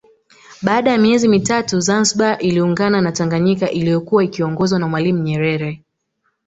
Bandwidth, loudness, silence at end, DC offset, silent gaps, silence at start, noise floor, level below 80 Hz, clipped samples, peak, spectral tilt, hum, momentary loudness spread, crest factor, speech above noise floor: 8.2 kHz; -16 LUFS; 0.7 s; under 0.1%; none; 0.5 s; -68 dBFS; -52 dBFS; under 0.1%; 0 dBFS; -5 dB/octave; none; 6 LU; 16 dB; 53 dB